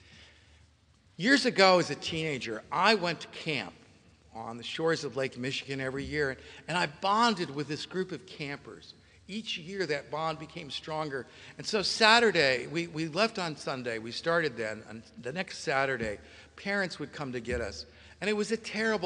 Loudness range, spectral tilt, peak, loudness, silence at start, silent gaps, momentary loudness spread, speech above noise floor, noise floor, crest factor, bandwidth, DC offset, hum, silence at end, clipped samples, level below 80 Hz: 7 LU; -4 dB/octave; -6 dBFS; -30 LUFS; 0.1 s; none; 16 LU; 33 dB; -63 dBFS; 26 dB; 10.5 kHz; under 0.1%; none; 0 s; under 0.1%; -60 dBFS